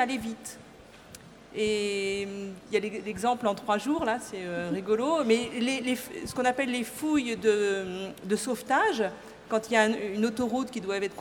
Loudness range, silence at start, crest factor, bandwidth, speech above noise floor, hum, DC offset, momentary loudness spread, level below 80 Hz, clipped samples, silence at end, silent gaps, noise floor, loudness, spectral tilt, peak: 3 LU; 0 s; 22 dB; 18 kHz; 22 dB; none; under 0.1%; 12 LU; -62 dBFS; under 0.1%; 0 s; none; -51 dBFS; -29 LUFS; -4 dB/octave; -8 dBFS